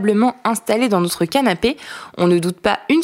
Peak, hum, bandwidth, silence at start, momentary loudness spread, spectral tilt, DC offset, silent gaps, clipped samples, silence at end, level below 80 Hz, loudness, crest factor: -2 dBFS; none; 16.5 kHz; 0 s; 5 LU; -5 dB/octave; under 0.1%; none; under 0.1%; 0 s; -50 dBFS; -17 LUFS; 16 dB